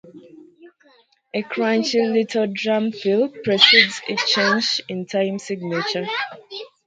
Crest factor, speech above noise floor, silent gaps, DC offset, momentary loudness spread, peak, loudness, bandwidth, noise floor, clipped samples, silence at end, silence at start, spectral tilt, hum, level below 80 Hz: 22 dB; 37 dB; none; under 0.1%; 14 LU; 0 dBFS; -19 LUFS; 9.2 kHz; -57 dBFS; under 0.1%; 0.2 s; 0.05 s; -3.5 dB/octave; none; -70 dBFS